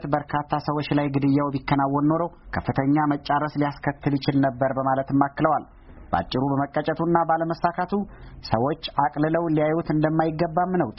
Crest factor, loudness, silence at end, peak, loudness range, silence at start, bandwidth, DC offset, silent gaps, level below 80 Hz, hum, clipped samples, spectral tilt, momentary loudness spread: 18 dB; -24 LUFS; 0.05 s; -4 dBFS; 1 LU; 0 s; 5.8 kHz; under 0.1%; none; -48 dBFS; none; under 0.1%; -6 dB/octave; 6 LU